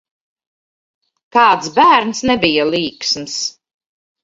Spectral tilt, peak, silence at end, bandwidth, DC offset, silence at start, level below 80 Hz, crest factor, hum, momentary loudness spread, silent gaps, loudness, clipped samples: -3 dB/octave; 0 dBFS; 0.75 s; 8 kHz; under 0.1%; 1.35 s; -52 dBFS; 16 dB; none; 9 LU; none; -14 LUFS; under 0.1%